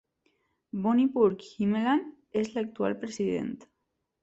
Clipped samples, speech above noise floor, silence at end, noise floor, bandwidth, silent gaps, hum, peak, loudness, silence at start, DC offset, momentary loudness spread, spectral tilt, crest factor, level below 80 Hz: under 0.1%; 53 dB; 0.6 s; -81 dBFS; 8.2 kHz; none; none; -12 dBFS; -29 LUFS; 0.75 s; under 0.1%; 9 LU; -6.5 dB/octave; 18 dB; -68 dBFS